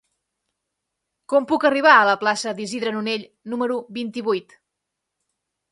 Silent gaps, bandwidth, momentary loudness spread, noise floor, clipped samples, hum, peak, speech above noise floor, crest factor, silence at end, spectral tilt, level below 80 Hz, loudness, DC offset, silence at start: none; 11.5 kHz; 14 LU; -81 dBFS; under 0.1%; none; 0 dBFS; 61 dB; 22 dB; 1.3 s; -3.5 dB/octave; -72 dBFS; -20 LUFS; under 0.1%; 1.3 s